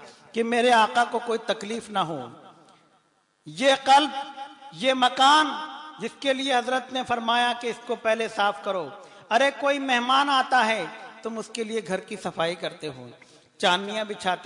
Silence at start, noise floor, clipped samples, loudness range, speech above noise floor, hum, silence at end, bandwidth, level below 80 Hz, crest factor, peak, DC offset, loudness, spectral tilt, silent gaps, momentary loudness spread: 0 s; -66 dBFS; under 0.1%; 5 LU; 42 dB; none; 0 s; 11 kHz; -74 dBFS; 18 dB; -8 dBFS; under 0.1%; -24 LUFS; -3 dB/octave; none; 17 LU